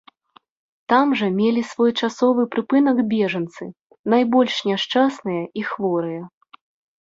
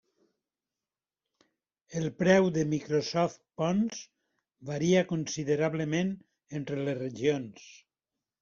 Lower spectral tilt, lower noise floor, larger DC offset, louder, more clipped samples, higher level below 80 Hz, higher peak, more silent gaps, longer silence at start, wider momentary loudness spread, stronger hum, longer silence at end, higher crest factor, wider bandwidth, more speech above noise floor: about the same, -6 dB/octave vs -6 dB/octave; second, -56 dBFS vs under -90 dBFS; neither; first, -20 LUFS vs -30 LUFS; neither; about the same, -66 dBFS vs -68 dBFS; first, -4 dBFS vs -10 dBFS; first, 3.81-3.86 s, 3.99-4.04 s vs none; second, 0.9 s vs 1.9 s; about the same, 13 LU vs 15 LU; neither; about the same, 0.75 s vs 0.65 s; second, 16 dB vs 22 dB; about the same, 7.8 kHz vs 7.4 kHz; second, 37 dB vs over 61 dB